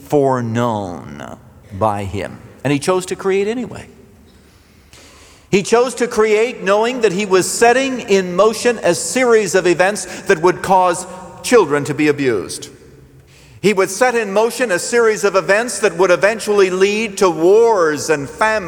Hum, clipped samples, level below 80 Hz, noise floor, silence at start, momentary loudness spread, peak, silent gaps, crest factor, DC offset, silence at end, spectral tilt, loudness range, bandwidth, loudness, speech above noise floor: none; under 0.1%; -52 dBFS; -47 dBFS; 0 s; 12 LU; -2 dBFS; none; 14 dB; under 0.1%; 0 s; -4 dB/octave; 7 LU; 19 kHz; -15 LUFS; 32 dB